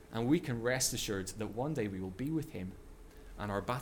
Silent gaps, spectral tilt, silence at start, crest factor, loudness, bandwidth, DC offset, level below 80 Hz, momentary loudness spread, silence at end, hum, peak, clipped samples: none; -4.5 dB/octave; 0 s; 18 dB; -36 LUFS; 18 kHz; under 0.1%; -54 dBFS; 14 LU; 0 s; none; -18 dBFS; under 0.1%